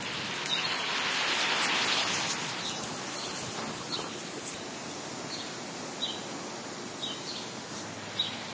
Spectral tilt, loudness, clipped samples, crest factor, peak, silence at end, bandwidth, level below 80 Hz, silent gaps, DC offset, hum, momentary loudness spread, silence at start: -1.5 dB/octave; -32 LUFS; under 0.1%; 20 dB; -14 dBFS; 0 s; 8 kHz; -68 dBFS; none; under 0.1%; none; 12 LU; 0 s